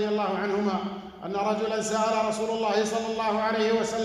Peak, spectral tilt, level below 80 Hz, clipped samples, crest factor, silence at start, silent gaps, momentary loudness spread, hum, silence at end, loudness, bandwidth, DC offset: -12 dBFS; -4.5 dB/octave; -62 dBFS; under 0.1%; 14 dB; 0 s; none; 6 LU; none; 0 s; -27 LUFS; 12.5 kHz; under 0.1%